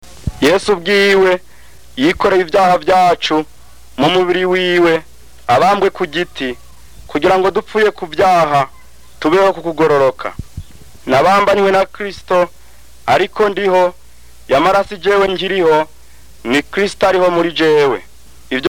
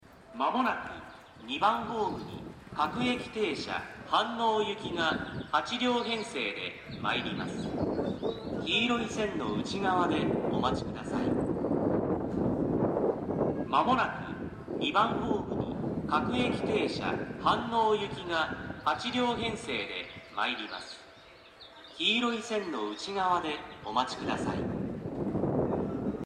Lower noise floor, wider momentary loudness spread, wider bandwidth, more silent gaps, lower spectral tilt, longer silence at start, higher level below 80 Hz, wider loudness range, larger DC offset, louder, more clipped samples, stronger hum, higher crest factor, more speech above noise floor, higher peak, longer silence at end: second, -44 dBFS vs -54 dBFS; first, 13 LU vs 10 LU; first, 19 kHz vs 11 kHz; neither; about the same, -5 dB/octave vs -5.5 dB/octave; first, 0.25 s vs 0.05 s; first, -42 dBFS vs -56 dBFS; about the same, 2 LU vs 3 LU; first, 2% vs under 0.1%; first, -13 LUFS vs -31 LUFS; neither; neither; second, 8 dB vs 20 dB; first, 31 dB vs 23 dB; first, -6 dBFS vs -12 dBFS; about the same, 0 s vs 0 s